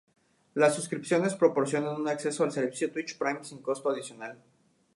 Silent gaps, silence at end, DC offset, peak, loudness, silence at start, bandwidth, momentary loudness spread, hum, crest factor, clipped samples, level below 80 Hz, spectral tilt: none; 0.6 s; under 0.1%; -10 dBFS; -29 LUFS; 0.55 s; 11.5 kHz; 11 LU; none; 20 dB; under 0.1%; -80 dBFS; -5 dB/octave